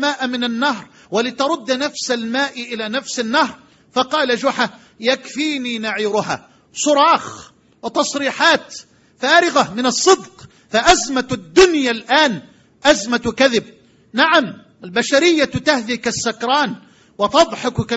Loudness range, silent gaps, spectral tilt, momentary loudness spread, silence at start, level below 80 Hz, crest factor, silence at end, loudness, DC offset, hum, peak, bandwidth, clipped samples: 5 LU; none; -3 dB/octave; 10 LU; 0 s; -48 dBFS; 18 dB; 0 s; -17 LUFS; under 0.1%; none; 0 dBFS; 9.2 kHz; under 0.1%